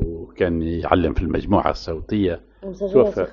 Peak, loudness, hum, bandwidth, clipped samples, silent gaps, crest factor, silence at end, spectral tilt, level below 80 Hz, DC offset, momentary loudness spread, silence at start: 0 dBFS; -21 LUFS; none; 7.2 kHz; under 0.1%; none; 20 dB; 0 s; -6.5 dB/octave; -34 dBFS; under 0.1%; 11 LU; 0 s